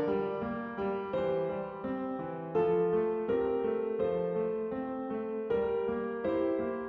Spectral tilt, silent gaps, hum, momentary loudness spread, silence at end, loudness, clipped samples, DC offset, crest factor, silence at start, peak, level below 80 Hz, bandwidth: -6.5 dB/octave; none; none; 7 LU; 0 s; -33 LUFS; under 0.1%; under 0.1%; 12 dB; 0 s; -20 dBFS; -62 dBFS; 4.6 kHz